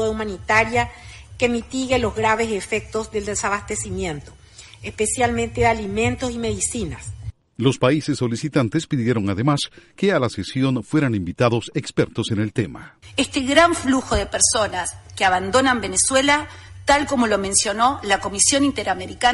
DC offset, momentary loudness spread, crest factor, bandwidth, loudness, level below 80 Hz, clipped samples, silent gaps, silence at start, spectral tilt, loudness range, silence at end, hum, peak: under 0.1%; 11 LU; 20 dB; 11.5 kHz; -20 LUFS; -40 dBFS; under 0.1%; none; 0 s; -3.5 dB/octave; 5 LU; 0 s; none; 0 dBFS